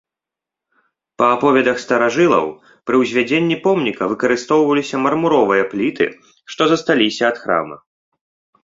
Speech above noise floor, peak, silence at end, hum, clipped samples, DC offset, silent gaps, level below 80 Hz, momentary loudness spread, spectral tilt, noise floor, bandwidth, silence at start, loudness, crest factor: 70 dB; -2 dBFS; 0.9 s; none; under 0.1%; under 0.1%; none; -58 dBFS; 6 LU; -5 dB/octave; -86 dBFS; 7.8 kHz; 1.2 s; -16 LUFS; 16 dB